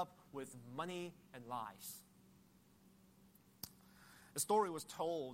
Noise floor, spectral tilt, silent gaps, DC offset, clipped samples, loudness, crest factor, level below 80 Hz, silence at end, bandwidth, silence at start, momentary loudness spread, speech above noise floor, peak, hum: -69 dBFS; -3.5 dB/octave; none; under 0.1%; under 0.1%; -44 LUFS; 22 dB; -82 dBFS; 0 s; 16 kHz; 0 s; 20 LU; 26 dB; -24 dBFS; none